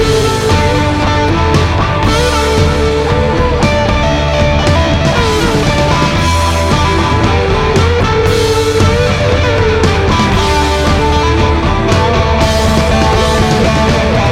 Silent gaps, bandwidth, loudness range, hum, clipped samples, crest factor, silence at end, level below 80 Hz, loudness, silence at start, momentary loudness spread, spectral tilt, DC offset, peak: none; 15 kHz; 1 LU; none; under 0.1%; 10 dB; 0 s; -18 dBFS; -11 LUFS; 0 s; 1 LU; -5.5 dB/octave; under 0.1%; 0 dBFS